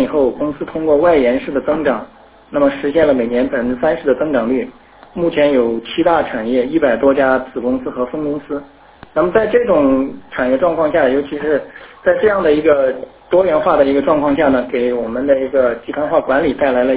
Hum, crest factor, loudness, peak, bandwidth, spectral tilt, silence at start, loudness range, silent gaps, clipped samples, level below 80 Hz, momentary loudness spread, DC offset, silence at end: none; 14 dB; -15 LUFS; 0 dBFS; 4 kHz; -10 dB/octave; 0 s; 2 LU; none; under 0.1%; -44 dBFS; 8 LU; under 0.1%; 0 s